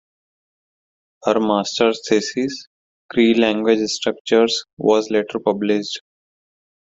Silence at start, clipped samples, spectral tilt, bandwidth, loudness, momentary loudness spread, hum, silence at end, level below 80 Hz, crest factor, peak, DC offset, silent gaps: 1.25 s; under 0.1%; -4 dB/octave; 8 kHz; -19 LUFS; 9 LU; none; 1 s; -62 dBFS; 18 dB; -2 dBFS; under 0.1%; 2.67-3.09 s, 4.21-4.25 s, 4.73-4.77 s